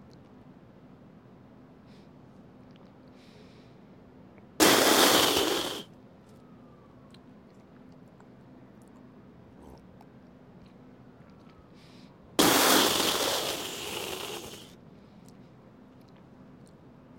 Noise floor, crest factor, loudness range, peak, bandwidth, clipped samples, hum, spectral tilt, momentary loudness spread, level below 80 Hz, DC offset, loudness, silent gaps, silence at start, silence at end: -53 dBFS; 24 dB; 14 LU; -8 dBFS; 16.5 kHz; under 0.1%; none; -1.5 dB/octave; 20 LU; -64 dBFS; under 0.1%; -24 LUFS; none; 4.6 s; 1.75 s